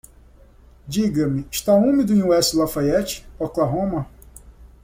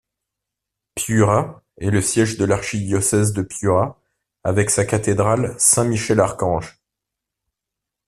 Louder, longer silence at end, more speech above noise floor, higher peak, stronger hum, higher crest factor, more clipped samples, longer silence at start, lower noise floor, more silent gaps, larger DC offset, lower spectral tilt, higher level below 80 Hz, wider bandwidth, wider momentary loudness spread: about the same, -20 LUFS vs -19 LUFS; second, 0.2 s vs 1.35 s; second, 29 dB vs 66 dB; second, -6 dBFS vs 0 dBFS; neither; about the same, 16 dB vs 20 dB; neither; about the same, 0.85 s vs 0.95 s; second, -48 dBFS vs -84 dBFS; neither; neither; about the same, -5.5 dB/octave vs -5 dB/octave; about the same, -44 dBFS vs -48 dBFS; first, 16.5 kHz vs 14 kHz; about the same, 12 LU vs 11 LU